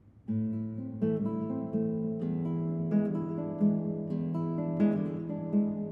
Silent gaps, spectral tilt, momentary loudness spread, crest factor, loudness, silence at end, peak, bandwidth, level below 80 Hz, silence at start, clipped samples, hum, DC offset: none; -12 dB/octave; 6 LU; 16 dB; -32 LUFS; 0 s; -16 dBFS; 3.4 kHz; -66 dBFS; 0.05 s; under 0.1%; none; under 0.1%